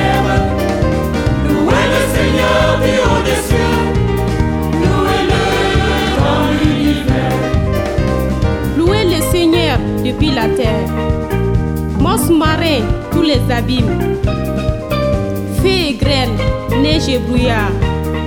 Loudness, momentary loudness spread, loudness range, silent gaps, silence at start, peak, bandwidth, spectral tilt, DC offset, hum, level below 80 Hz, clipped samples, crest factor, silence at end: -14 LUFS; 5 LU; 2 LU; none; 0 s; 0 dBFS; 18.5 kHz; -6 dB/octave; under 0.1%; none; -22 dBFS; under 0.1%; 14 dB; 0 s